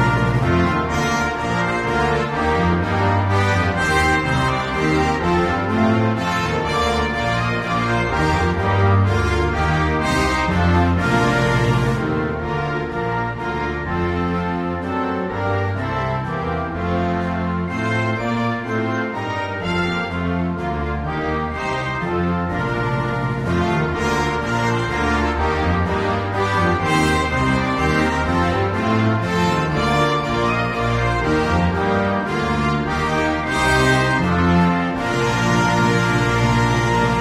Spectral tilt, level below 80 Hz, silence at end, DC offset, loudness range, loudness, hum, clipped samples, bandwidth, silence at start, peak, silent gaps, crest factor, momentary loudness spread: -6 dB/octave; -32 dBFS; 0 s; under 0.1%; 5 LU; -19 LUFS; none; under 0.1%; 14.5 kHz; 0 s; -4 dBFS; none; 14 dB; 6 LU